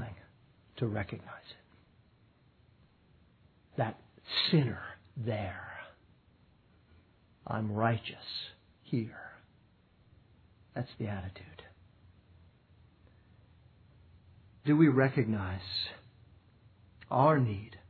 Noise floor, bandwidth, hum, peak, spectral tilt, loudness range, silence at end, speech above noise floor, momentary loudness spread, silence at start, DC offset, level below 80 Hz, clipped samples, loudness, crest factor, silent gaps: -66 dBFS; 4.6 kHz; none; -12 dBFS; -9 dB/octave; 14 LU; 0.1 s; 34 dB; 25 LU; 0 s; under 0.1%; -66 dBFS; under 0.1%; -33 LUFS; 24 dB; none